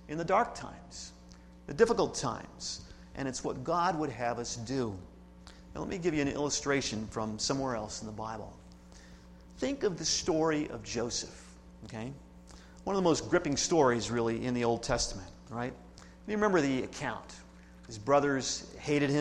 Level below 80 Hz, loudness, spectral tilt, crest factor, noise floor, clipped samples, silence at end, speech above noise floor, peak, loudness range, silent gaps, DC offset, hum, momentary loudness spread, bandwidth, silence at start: -54 dBFS; -32 LUFS; -4 dB/octave; 22 dB; -53 dBFS; under 0.1%; 0 s; 21 dB; -12 dBFS; 5 LU; none; under 0.1%; none; 19 LU; 12 kHz; 0 s